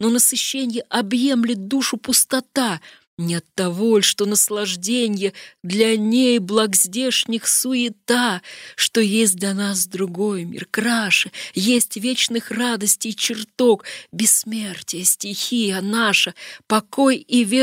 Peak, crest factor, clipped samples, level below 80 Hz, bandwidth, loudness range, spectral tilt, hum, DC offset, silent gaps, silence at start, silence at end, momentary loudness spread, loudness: -2 dBFS; 16 dB; under 0.1%; -70 dBFS; 16 kHz; 2 LU; -2.5 dB/octave; none; under 0.1%; 3.07-3.17 s; 0 s; 0 s; 8 LU; -19 LUFS